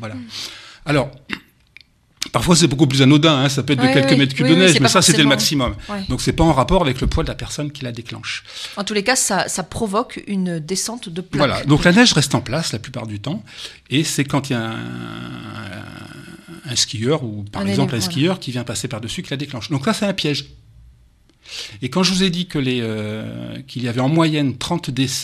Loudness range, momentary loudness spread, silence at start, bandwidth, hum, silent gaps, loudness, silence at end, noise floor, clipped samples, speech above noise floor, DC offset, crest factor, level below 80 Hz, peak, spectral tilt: 10 LU; 18 LU; 0 s; 14.5 kHz; none; none; -18 LUFS; 0 s; -53 dBFS; under 0.1%; 35 dB; under 0.1%; 18 dB; -38 dBFS; 0 dBFS; -4.5 dB/octave